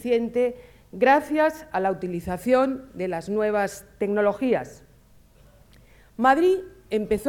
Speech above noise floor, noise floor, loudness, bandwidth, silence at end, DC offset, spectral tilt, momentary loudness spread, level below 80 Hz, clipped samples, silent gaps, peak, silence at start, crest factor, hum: 31 dB; -54 dBFS; -24 LUFS; 17.5 kHz; 0 s; under 0.1%; -6 dB/octave; 11 LU; -54 dBFS; under 0.1%; none; -6 dBFS; 0 s; 20 dB; none